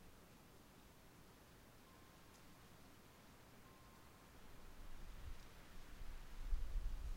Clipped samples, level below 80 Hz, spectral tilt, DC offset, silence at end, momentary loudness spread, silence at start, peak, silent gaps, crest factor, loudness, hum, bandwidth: under 0.1%; -52 dBFS; -4.5 dB/octave; under 0.1%; 0 s; 14 LU; 0 s; -30 dBFS; none; 22 dB; -59 LUFS; none; 16 kHz